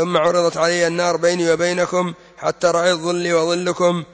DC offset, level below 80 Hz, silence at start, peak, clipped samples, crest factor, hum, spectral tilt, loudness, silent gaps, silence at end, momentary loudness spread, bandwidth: under 0.1%; -60 dBFS; 0 s; -4 dBFS; under 0.1%; 14 dB; none; -4 dB/octave; -18 LUFS; none; 0.1 s; 4 LU; 8 kHz